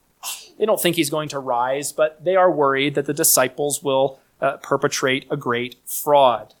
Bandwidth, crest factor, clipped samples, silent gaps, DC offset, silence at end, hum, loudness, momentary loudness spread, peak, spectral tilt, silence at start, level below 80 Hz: 19 kHz; 18 dB; under 0.1%; none; under 0.1%; 0.15 s; none; -20 LUFS; 9 LU; -2 dBFS; -3 dB/octave; 0.25 s; -66 dBFS